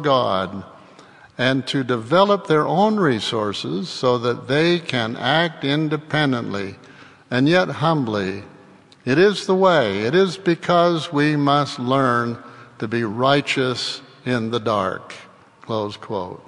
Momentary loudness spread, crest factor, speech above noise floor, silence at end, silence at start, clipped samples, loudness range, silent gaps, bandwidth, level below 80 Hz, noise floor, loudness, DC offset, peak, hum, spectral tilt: 11 LU; 18 dB; 28 dB; 0.05 s; 0 s; under 0.1%; 4 LU; none; 11 kHz; -64 dBFS; -48 dBFS; -20 LUFS; under 0.1%; -2 dBFS; none; -6 dB/octave